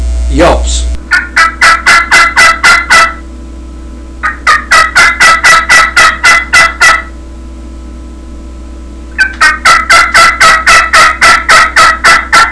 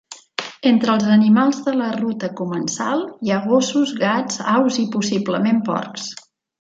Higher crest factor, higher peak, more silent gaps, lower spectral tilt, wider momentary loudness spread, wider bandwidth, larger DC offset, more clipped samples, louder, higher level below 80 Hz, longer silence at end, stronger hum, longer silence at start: second, 6 dB vs 16 dB; first, 0 dBFS vs -4 dBFS; neither; second, -1.5 dB/octave vs -5 dB/octave; second, 9 LU vs 13 LU; first, 11 kHz vs 7.8 kHz; neither; first, 8% vs under 0.1%; first, -3 LUFS vs -19 LUFS; first, -20 dBFS vs -66 dBFS; second, 0 s vs 0.5 s; neither; about the same, 0 s vs 0.1 s